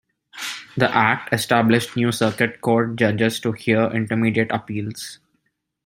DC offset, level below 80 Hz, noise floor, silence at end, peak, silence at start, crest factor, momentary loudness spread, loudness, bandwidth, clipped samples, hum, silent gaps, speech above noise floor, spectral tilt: under 0.1%; -60 dBFS; -72 dBFS; 0.7 s; -2 dBFS; 0.35 s; 20 dB; 13 LU; -20 LUFS; 16.5 kHz; under 0.1%; none; none; 52 dB; -5.5 dB/octave